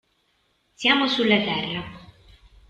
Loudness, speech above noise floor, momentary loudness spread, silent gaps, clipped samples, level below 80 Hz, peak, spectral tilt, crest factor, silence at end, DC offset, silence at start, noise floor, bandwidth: -21 LUFS; 46 dB; 13 LU; none; under 0.1%; -56 dBFS; -6 dBFS; -4.5 dB/octave; 20 dB; 0.65 s; under 0.1%; 0.8 s; -68 dBFS; 9 kHz